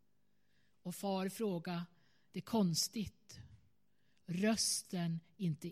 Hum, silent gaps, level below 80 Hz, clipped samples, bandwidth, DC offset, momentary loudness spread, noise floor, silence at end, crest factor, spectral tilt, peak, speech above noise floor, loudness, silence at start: 50 Hz at -60 dBFS; none; -72 dBFS; under 0.1%; 16 kHz; under 0.1%; 19 LU; -81 dBFS; 0 s; 18 dB; -4 dB/octave; -22 dBFS; 43 dB; -38 LUFS; 0.85 s